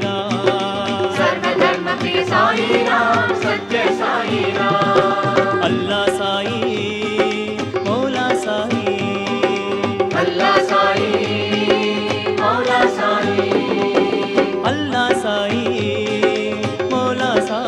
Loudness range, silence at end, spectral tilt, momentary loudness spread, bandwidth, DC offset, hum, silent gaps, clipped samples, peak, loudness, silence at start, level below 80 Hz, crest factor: 3 LU; 0 s; -5 dB/octave; 5 LU; 12 kHz; under 0.1%; none; none; under 0.1%; -2 dBFS; -17 LUFS; 0 s; -58 dBFS; 16 dB